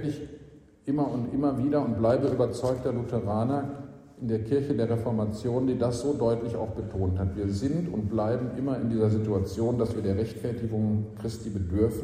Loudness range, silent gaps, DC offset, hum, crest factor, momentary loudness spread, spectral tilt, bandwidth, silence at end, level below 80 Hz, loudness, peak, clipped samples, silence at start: 1 LU; none; under 0.1%; none; 16 dB; 8 LU; -8.5 dB/octave; 14.5 kHz; 0 s; -50 dBFS; -28 LUFS; -12 dBFS; under 0.1%; 0 s